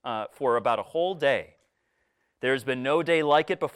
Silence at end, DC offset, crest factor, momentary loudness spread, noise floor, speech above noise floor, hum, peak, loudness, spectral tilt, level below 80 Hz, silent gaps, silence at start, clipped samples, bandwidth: 0.05 s; under 0.1%; 18 dB; 7 LU; -74 dBFS; 49 dB; none; -10 dBFS; -26 LUFS; -5.5 dB/octave; -70 dBFS; none; 0.05 s; under 0.1%; 14 kHz